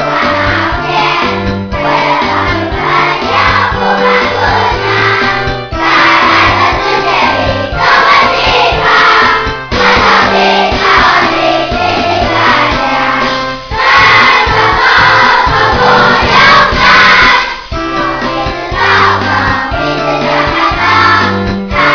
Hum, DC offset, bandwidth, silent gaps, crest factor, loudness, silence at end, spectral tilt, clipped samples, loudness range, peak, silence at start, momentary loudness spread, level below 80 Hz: none; under 0.1%; 5.4 kHz; none; 8 dB; -7 LUFS; 0 s; -4.5 dB/octave; 1%; 5 LU; 0 dBFS; 0 s; 8 LU; -26 dBFS